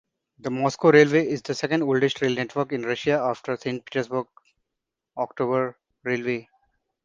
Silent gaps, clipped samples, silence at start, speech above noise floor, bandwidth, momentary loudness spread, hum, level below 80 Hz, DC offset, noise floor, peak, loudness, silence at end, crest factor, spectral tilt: none; under 0.1%; 0.45 s; 61 dB; 7.6 kHz; 14 LU; none; -66 dBFS; under 0.1%; -84 dBFS; -2 dBFS; -24 LUFS; 0.65 s; 22 dB; -6 dB/octave